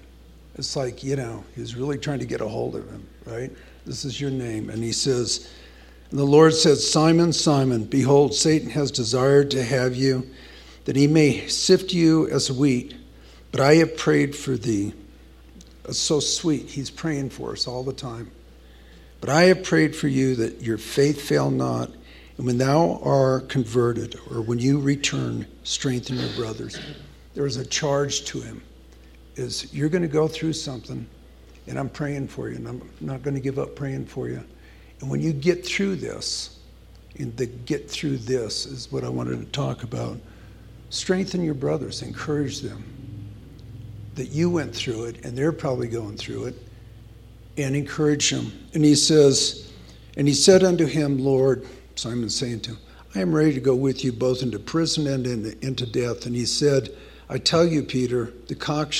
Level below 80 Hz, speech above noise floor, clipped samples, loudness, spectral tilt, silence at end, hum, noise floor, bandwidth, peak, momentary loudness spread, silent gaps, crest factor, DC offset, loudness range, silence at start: -48 dBFS; 25 dB; under 0.1%; -23 LUFS; -5 dB/octave; 0 s; none; -47 dBFS; 14.5 kHz; -2 dBFS; 18 LU; none; 22 dB; under 0.1%; 10 LU; 0.55 s